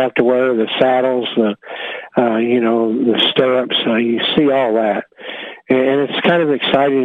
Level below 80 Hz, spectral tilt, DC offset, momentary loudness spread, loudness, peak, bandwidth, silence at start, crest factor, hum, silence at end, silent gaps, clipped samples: -58 dBFS; -7 dB/octave; under 0.1%; 10 LU; -15 LUFS; 0 dBFS; 4.8 kHz; 0 s; 14 dB; none; 0 s; none; under 0.1%